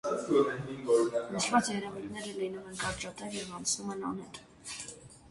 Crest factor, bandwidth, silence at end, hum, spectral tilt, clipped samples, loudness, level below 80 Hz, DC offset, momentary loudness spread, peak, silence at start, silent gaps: 22 dB; 11.5 kHz; 0 s; none; -3.5 dB/octave; under 0.1%; -33 LUFS; -64 dBFS; under 0.1%; 14 LU; -12 dBFS; 0.05 s; none